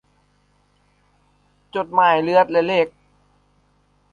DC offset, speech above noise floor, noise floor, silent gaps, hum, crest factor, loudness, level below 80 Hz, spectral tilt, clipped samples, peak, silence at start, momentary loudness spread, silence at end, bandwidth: under 0.1%; 44 dB; -61 dBFS; none; 50 Hz at -60 dBFS; 20 dB; -18 LUFS; -62 dBFS; -6.5 dB/octave; under 0.1%; -2 dBFS; 1.75 s; 11 LU; 1.25 s; 7.2 kHz